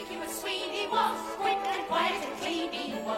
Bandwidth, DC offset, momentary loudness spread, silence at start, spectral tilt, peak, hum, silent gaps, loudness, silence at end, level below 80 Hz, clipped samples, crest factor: 16 kHz; under 0.1%; 6 LU; 0 s; -2.5 dB/octave; -14 dBFS; none; none; -30 LUFS; 0 s; -64 dBFS; under 0.1%; 18 dB